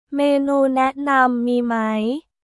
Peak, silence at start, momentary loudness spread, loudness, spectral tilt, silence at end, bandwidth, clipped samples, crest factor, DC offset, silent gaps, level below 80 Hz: -4 dBFS; 0.1 s; 5 LU; -19 LUFS; -5.5 dB/octave; 0.25 s; 12 kHz; under 0.1%; 16 dB; under 0.1%; none; -62 dBFS